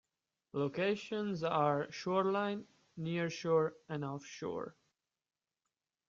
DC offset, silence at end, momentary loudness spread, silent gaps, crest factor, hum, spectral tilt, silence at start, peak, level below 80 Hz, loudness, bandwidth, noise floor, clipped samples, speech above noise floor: under 0.1%; 1.4 s; 12 LU; none; 20 dB; none; -6 dB/octave; 0.55 s; -18 dBFS; -78 dBFS; -37 LUFS; 7.6 kHz; under -90 dBFS; under 0.1%; over 54 dB